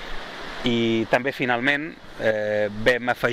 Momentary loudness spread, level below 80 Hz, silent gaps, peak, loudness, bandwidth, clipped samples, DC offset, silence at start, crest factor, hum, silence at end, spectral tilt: 13 LU; -44 dBFS; none; -6 dBFS; -23 LUFS; 16 kHz; under 0.1%; under 0.1%; 0 s; 18 dB; none; 0 s; -5.5 dB/octave